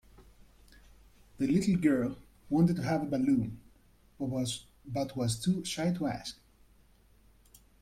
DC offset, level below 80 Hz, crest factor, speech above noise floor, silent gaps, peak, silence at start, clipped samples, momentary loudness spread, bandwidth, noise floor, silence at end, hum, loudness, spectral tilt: under 0.1%; -58 dBFS; 18 dB; 32 dB; none; -14 dBFS; 0.2 s; under 0.1%; 13 LU; 15.5 kHz; -62 dBFS; 1.5 s; none; -31 LUFS; -6 dB/octave